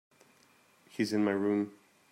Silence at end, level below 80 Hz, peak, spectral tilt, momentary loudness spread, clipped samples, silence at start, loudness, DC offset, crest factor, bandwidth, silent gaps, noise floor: 0.4 s; -82 dBFS; -18 dBFS; -6 dB/octave; 11 LU; under 0.1%; 0.95 s; -32 LUFS; under 0.1%; 16 dB; 15.5 kHz; none; -65 dBFS